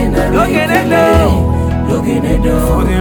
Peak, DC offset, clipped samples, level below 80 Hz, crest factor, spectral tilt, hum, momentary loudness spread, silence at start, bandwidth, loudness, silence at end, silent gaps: 0 dBFS; under 0.1%; under 0.1%; -18 dBFS; 10 dB; -6.5 dB/octave; none; 5 LU; 0 s; over 20 kHz; -12 LUFS; 0 s; none